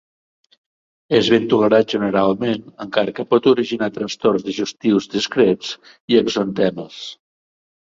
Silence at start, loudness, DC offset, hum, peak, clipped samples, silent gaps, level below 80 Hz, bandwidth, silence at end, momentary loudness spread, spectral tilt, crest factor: 1.1 s; -18 LUFS; under 0.1%; none; -2 dBFS; under 0.1%; 6.00-6.08 s; -58 dBFS; 7.8 kHz; 0.7 s; 11 LU; -5.5 dB/octave; 18 dB